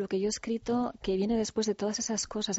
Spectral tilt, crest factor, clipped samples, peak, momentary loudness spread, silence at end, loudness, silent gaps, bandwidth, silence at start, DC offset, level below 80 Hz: -4.5 dB/octave; 12 dB; under 0.1%; -20 dBFS; 2 LU; 0 s; -31 LUFS; none; 8 kHz; 0 s; under 0.1%; -56 dBFS